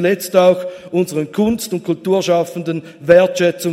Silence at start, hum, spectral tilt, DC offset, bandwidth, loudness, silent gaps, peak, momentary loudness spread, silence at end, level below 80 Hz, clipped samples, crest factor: 0 s; none; -5.5 dB/octave; under 0.1%; 16 kHz; -16 LUFS; none; 0 dBFS; 10 LU; 0 s; -54 dBFS; under 0.1%; 16 dB